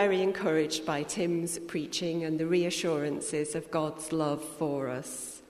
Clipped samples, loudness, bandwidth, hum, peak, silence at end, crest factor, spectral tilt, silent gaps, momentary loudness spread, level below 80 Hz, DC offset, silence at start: under 0.1%; -31 LUFS; 13.5 kHz; none; -14 dBFS; 0.1 s; 16 dB; -4.5 dB/octave; none; 6 LU; -66 dBFS; under 0.1%; 0 s